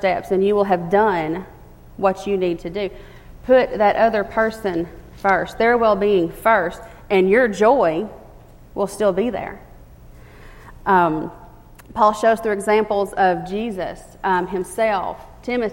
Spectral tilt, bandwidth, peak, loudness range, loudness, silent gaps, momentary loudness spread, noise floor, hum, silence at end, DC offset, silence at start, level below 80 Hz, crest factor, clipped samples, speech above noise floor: -6 dB/octave; 16.5 kHz; -2 dBFS; 5 LU; -19 LUFS; none; 13 LU; -43 dBFS; none; 0 s; under 0.1%; 0 s; -44 dBFS; 18 dB; under 0.1%; 25 dB